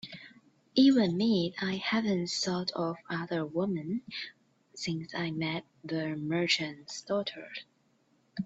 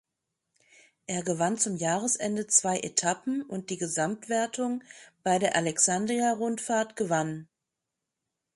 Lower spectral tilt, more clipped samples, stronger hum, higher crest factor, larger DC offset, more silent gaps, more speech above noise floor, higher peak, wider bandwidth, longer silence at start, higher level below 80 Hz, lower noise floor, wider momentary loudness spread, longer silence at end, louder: first, -5 dB/octave vs -3 dB/octave; neither; neither; second, 18 dB vs 24 dB; neither; neither; second, 39 dB vs 58 dB; second, -14 dBFS vs -6 dBFS; second, 8 kHz vs 11.5 kHz; second, 0.05 s vs 1.1 s; about the same, -72 dBFS vs -74 dBFS; second, -70 dBFS vs -86 dBFS; first, 17 LU vs 11 LU; second, 0 s vs 1.1 s; second, -31 LUFS vs -28 LUFS